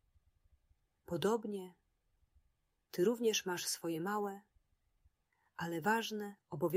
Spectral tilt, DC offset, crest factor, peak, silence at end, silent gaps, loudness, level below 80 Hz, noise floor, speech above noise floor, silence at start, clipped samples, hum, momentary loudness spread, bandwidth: -4 dB/octave; under 0.1%; 22 dB; -18 dBFS; 0 s; none; -38 LUFS; -76 dBFS; -80 dBFS; 43 dB; 1.1 s; under 0.1%; none; 12 LU; 16 kHz